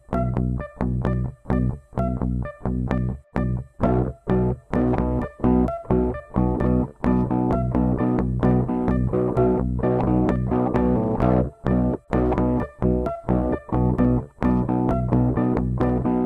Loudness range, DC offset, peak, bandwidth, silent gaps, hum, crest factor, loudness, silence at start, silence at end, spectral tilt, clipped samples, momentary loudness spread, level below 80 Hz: 4 LU; under 0.1%; -6 dBFS; 4.4 kHz; none; none; 16 dB; -23 LUFS; 0.1 s; 0 s; -11 dB/octave; under 0.1%; 6 LU; -30 dBFS